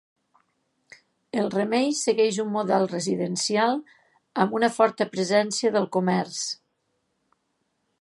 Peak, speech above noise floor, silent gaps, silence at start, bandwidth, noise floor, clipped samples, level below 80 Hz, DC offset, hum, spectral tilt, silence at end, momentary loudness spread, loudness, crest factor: -4 dBFS; 51 dB; none; 1.35 s; 11.5 kHz; -74 dBFS; under 0.1%; -76 dBFS; under 0.1%; none; -4 dB/octave; 1.45 s; 8 LU; -24 LUFS; 22 dB